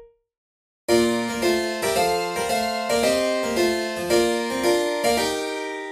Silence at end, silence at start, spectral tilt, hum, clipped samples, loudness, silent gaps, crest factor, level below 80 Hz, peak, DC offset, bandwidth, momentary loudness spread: 0 s; 0 s; -3 dB/octave; none; under 0.1%; -22 LUFS; 0.37-0.88 s; 16 dB; -52 dBFS; -6 dBFS; under 0.1%; 15.5 kHz; 4 LU